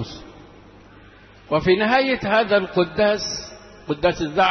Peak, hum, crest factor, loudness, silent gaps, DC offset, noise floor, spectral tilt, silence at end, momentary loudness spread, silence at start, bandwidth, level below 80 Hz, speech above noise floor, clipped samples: -6 dBFS; none; 16 dB; -20 LUFS; none; under 0.1%; -47 dBFS; -4.5 dB/octave; 0 s; 16 LU; 0 s; 6.4 kHz; -48 dBFS; 28 dB; under 0.1%